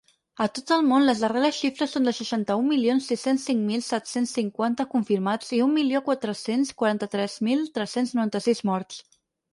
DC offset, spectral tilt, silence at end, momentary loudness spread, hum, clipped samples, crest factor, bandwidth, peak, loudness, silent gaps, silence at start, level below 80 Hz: under 0.1%; -5 dB/octave; 0.55 s; 6 LU; none; under 0.1%; 16 dB; 11.5 kHz; -8 dBFS; -25 LUFS; none; 0.4 s; -70 dBFS